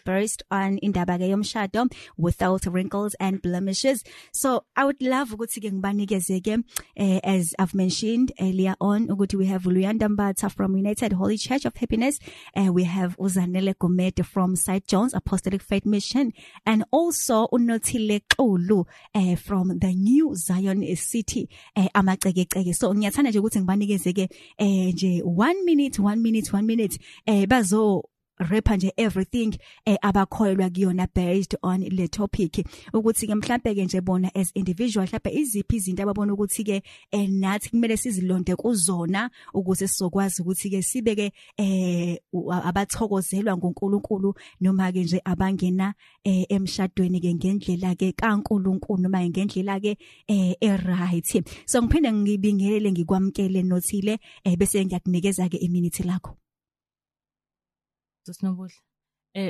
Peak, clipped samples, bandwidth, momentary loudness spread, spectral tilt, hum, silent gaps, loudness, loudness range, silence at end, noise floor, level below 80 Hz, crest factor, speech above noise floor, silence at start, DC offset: -2 dBFS; under 0.1%; 13 kHz; 6 LU; -5.5 dB/octave; none; none; -24 LUFS; 3 LU; 0 s; under -90 dBFS; -44 dBFS; 20 dB; over 67 dB; 0.05 s; under 0.1%